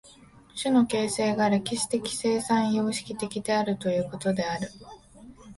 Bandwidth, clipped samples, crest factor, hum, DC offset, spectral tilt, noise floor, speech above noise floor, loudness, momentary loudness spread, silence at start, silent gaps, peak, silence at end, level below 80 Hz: 11.5 kHz; under 0.1%; 16 dB; none; under 0.1%; -4.5 dB/octave; -53 dBFS; 27 dB; -26 LUFS; 9 LU; 0.05 s; none; -12 dBFS; 0.05 s; -60 dBFS